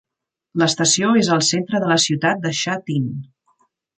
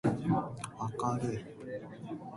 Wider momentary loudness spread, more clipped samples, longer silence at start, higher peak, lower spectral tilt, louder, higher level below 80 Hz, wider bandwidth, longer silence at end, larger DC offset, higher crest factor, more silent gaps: about the same, 9 LU vs 11 LU; neither; first, 0.55 s vs 0.05 s; first, -4 dBFS vs -18 dBFS; second, -3.5 dB/octave vs -7 dB/octave; first, -18 LUFS vs -36 LUFS; about the same, -62 dBFS vs -62 dBFS; second, 9.6 kHz vs 11.5 kHz; first, 0.75 s vs 0 s; neither; about the same, 16 dB vs 18 dB; neither